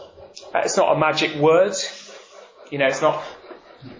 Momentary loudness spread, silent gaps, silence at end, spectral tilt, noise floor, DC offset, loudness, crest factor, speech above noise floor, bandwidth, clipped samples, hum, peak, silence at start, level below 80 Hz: 22 LU; none; 0.05 s; -3.5 dB/octave; -45 dBFS; under 0.1%; -20 LUFS; 16 dB; 26 dB; 7.6 kHz; under 0.1%; none; -6 dBFS; 0 s; -62 dBFS